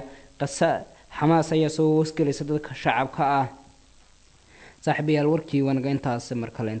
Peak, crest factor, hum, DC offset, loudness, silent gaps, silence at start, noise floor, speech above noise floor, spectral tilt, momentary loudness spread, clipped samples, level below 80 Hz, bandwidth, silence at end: -6 dBFS; 18 dB; none; under 0.1%; -24 LUFS; none; 0 s; -55 dBFS; 32 dB; -6.5 dB/octave; 10 LU; under 0.1%; -56 dBFS; 9 kHz; 0 s